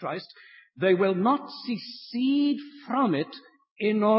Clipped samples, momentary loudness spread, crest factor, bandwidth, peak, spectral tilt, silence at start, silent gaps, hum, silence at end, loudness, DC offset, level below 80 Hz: under 0.1%; 13 LU; 18 dB; 5.8 kHz; -10 dBFS; -10.5 dB/octave; 0 s; 3.71-3.76 s; none; 0 s; -27 LUFS; under 0.1%; -80 dBFS